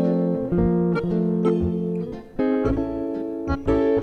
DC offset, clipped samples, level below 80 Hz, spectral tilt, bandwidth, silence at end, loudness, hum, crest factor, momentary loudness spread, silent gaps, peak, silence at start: under 0.1%; under 0.1%; -38 dBFS; -10 dB/octave; 5.8 kHz; 0 s; -23 LUFS; none; 12 dB; 7 LU; none; -8 dBFS; 0 s